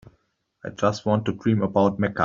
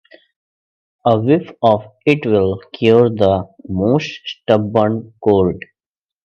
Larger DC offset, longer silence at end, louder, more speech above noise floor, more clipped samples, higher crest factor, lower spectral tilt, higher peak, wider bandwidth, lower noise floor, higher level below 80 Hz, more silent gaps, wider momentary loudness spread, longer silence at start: neither; second, 0 s vs 0.65 s; second, -23 LUFS vs -16 LUFS; second, 46 dB vs over 75 dB; neither; about the same, 18 dB vs 16 dB; second, -6.5 dB/octave vs -8 dB/octave; second, -4 dBFS vs 0 dBFS; about the same, 7.6 kHz vs 7 kHz; second, -68 dBFS vs under -90 dBFS; about the same, -58 dBFS vs -56 dBFS; neither; first, 11 LU vs 8 LU; second, 0.65 s vs 1.05 s